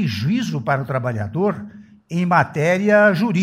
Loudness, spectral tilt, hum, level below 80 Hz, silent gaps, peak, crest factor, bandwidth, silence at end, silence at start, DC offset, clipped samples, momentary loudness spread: -19 LUFS; -7 dB/octave; none; -58 dBFS; none; -2 dBFS; 16 dB; 15.5 kHz; 0 s; 0 s; under 0.1%; under 0.1%; 10 LU